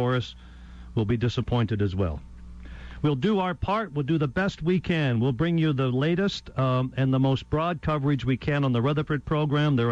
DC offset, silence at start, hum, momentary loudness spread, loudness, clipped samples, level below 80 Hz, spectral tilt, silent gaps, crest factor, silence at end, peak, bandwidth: under 0.1%; 0 s; none; 6 LU; -26 LUFS; under 0.1%; -44 dBFS; -8 dB/octave; none; 10 dB; 0 s; -14 dBFS; 7.8 kHz